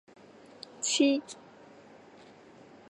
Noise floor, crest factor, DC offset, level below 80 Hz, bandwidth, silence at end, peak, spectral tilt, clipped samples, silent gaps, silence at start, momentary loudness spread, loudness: -54 dBFS; 22 dB; under 0.1%; -82 dBFS; 11.5 kHz; 1.55 s; -12 dBFS; -1.5 dB/octave; under 0.1%; none; 0.8 s; 23 LU; -28 LUFS